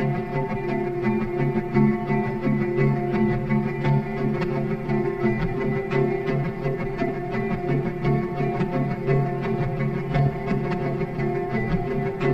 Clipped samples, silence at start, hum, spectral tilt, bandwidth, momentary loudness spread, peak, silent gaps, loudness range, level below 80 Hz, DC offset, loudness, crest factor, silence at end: under 0.1%; 0 s; none; -9.5 dB/octave; 6 kHz; 4 LU; -8 dBFS; none; 2 LU; -40 dBFS; under 0.1%; -24 LUFS; 16 dB; 0 s